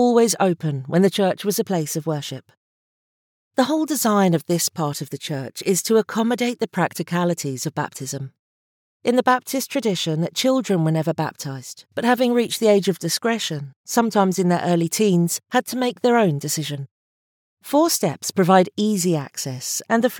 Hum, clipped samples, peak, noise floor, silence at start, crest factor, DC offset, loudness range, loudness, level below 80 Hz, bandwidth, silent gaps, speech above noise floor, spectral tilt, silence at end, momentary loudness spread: none; under 0.1%; -2 dBFS; under -90 dBFS; 0 s; 18 dB; under 0.1%; 3 LU; -21 LUFS; -76 dBFS; over 20 kHz; 2.57-3.51 s, 8.39-9.00 s, 13.76-13.84 s, 16.91-17.57 s; over 70 dB; -4.5 dB/octave; 0 s; 11 LU